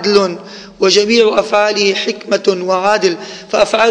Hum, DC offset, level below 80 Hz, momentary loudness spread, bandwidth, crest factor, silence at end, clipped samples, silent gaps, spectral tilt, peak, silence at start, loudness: none; under 0.1%; -52 dBFS; 9 LU; 9.8 kHz; 12 dB; 0 s; under 0.1%; none; -3 dB/octave; 0 dBFS; 0 s; -13 LUFS